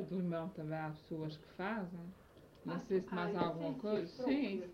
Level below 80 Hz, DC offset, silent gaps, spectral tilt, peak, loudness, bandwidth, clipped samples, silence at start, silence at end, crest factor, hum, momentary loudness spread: -70 dBFS; under 0.1%; none; -8 dB/octave; -22 dBFS; -40 LUFS; 15 kHz; under 0.1%; 0 s; 0 s; 18 dB; none; 10 LU